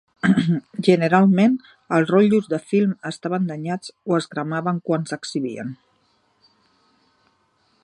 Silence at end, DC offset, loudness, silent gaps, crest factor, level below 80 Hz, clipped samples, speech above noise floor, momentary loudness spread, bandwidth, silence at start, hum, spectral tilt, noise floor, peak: 2.1 s; under 0.1%; -21 LUFS; none; 20 dB; -64 dBFS; under 0.1%; 44 dB; 12 LU; 10.5 kHz; 0.25 s; none; -7 dB/octave; -64 dBFS; -2 dBFS